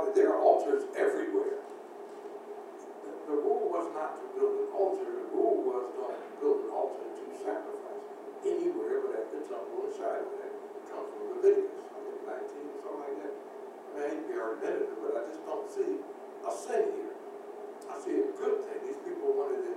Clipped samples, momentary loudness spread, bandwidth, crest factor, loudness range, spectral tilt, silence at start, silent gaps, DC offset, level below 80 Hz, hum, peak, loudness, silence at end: under 0.1%; 15 LU; 11.5 kHz; 24 dB; 4 LU; -4.5 dB/octave; 0 s; none; under 0.1%; under -90 dBFS; none; -10 dBFS; -33 LUFS; 0 s